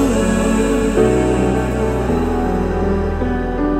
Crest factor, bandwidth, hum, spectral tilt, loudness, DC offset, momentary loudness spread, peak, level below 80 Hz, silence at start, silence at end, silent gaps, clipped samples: 14 dB; 15 kHz; none; -6.5 dB/octave; -17 LUFS; under 0.1%; 5 LU; -2 dBFS; -24 dBFS; 0 s; 0 s; none; under 0.1%